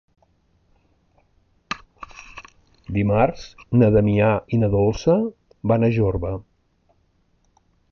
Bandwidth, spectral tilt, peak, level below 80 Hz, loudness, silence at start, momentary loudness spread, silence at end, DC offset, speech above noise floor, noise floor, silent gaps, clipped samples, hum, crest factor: 6.8 kHz; -8.5 dB/octave; -4 dBFS; -42 dBFS; -20 LUFS; 1.7 s; 23 LU; 1.5 s; under 0.1%; 45 dB; -64 dBFS; none; under 0.1%; none; 18 dB